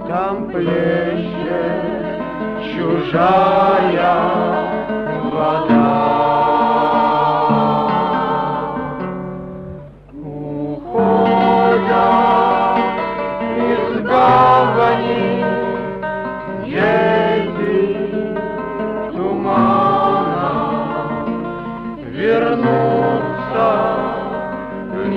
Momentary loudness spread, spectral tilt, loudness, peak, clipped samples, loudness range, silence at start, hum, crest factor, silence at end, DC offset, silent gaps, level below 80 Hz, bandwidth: 12 LU; -8.5 dB/octave; -16 LUFS; -2 dBFS; under 0.1%; 4 LU; 0 s; none; 14 dB; 0 s; under 0.1%; none; -46 dBFS; 6.4 kHz